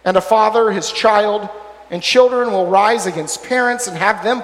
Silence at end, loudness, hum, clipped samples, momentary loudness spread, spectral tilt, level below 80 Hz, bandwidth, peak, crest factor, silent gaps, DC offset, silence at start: 0 s; -15 LUFS; none; under 0.1%; 11 LU; -3 dB/octave; -56 dBFS; 15.5 kHz; 0 dBFS; 14 dB; none; under 0.1%; 0.05 s